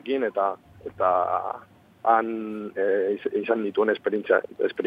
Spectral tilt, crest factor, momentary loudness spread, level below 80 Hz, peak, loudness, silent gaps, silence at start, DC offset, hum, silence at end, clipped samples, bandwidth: -7.5 dB/octave; 20 dB; 10 LU; -68 dBFS; -6 dBFS; -25 LUFS; none; 0.05 s; under 0.1%; none; 0 s; under 0.1%; 5 kHz